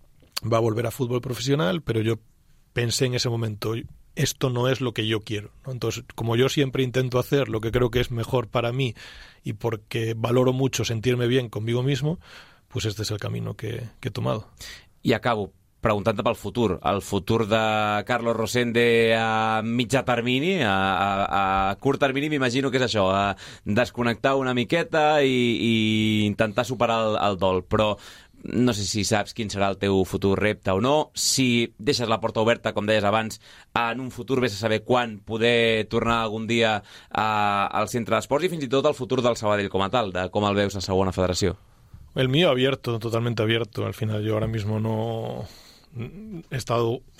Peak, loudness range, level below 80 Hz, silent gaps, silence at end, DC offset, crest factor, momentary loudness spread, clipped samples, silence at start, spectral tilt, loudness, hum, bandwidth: -6 dBFS; 5 LU; -48 dBFS; none; 0.2 s; under 0.1%; 18 dB; 10 LU; under 0.1%; 0.35 s; -5 dB/octave; -24 LUFS; none; 16 kHz